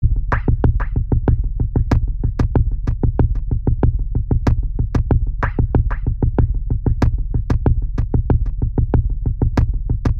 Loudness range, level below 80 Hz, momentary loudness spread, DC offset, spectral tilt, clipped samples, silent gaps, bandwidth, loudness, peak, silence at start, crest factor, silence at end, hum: 0 LU; -18 dBFS; 3 LU; under 0.1%; -9.5 dB/octave; under 0.1%; none; 6.2 kHz; -20 LUFS; -2 dBFS; 0 s; 14 dB; 0 s; none